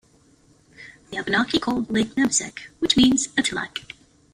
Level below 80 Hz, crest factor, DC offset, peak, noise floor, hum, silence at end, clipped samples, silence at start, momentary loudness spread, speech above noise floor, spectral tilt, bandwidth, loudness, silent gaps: -50 dBFS; 20 dB; under 0.1%; -4 dBFS; -57 dBFS; none; 0.5 s; under 0.1%; 0.8 s; 16 LU; 35 dB; -2.5 dB/octave; 15 kHz; -21 LUFS; none